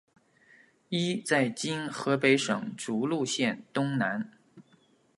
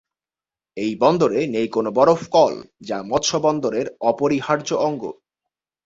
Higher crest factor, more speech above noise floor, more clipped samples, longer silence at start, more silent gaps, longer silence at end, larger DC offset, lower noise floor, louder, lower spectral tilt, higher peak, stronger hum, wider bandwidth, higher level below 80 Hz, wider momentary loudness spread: about the same, 22 dB vs 18 dB; second, 36 dB vs over 71 dB; neither; first, 0.9 s vs 0.75 s; neither; second, 0.55 s vs 0.75 s; neither; second, -64 dBFS vs under -90 dBFS; second, -29 LUFS vs -20 LUFS; about the same, -4.5 dB/octave vs -5 dB/octave; second, -10 dBFS vs -2 dBFS; neither; first, 11.5 kHz vs 7.8 kHz; second, -78 dBFS vs -58 dBFS; second, 9 LU vs 13 LU